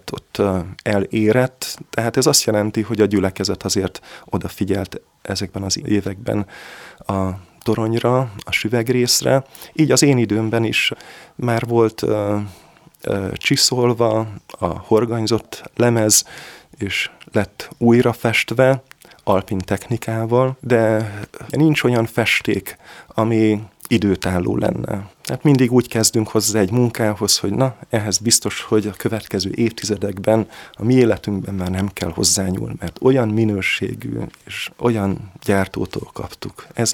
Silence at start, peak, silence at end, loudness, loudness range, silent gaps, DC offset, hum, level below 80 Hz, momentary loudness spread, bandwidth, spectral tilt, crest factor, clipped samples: 0.05 s; -2 dBFS; 0 s; -18 LUFS; 4 LU; none; under 0.1%; none; -48 dBFS; 13 LU; 19 kHz; -4.5 dB/octave; 18 dB; under 0.1%